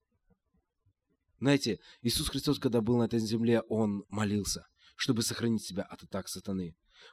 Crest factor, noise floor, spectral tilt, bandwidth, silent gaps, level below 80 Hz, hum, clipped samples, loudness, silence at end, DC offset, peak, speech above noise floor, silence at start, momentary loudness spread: 18 dB; -77 dBFS; -5 dB/octave; 15.5 kHz; none; -56 dBFS; none; under 0.1%; -32 LUFS; 0.05 s; under 0.1%; -14 dBFS; 46 dB; 1.4 s; 10 LU